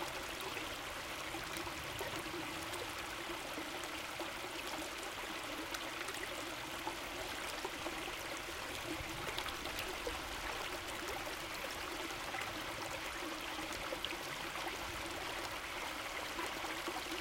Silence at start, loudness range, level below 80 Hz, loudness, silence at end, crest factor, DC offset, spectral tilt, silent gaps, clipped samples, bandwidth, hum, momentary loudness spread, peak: 0 s; 1 LU; -60 dBFS; -42 LUFS; 0 s; 22 dB; under 0.1%; -2 dB/octave; none; under 0.1%; 17 kHz; none; 2 LU; -20 dBFS